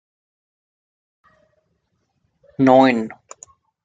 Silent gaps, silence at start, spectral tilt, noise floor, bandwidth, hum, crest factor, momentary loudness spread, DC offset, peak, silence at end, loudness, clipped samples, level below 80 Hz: none; 2.6 s; -6.5 dB/octave; -70 dBFS; 7.8 kHz; none; 20 dB; 26 LU; under 0.1%; -2 dBFS; 0.7 s; -15 LUFS; under 0.1%; -66 dBFS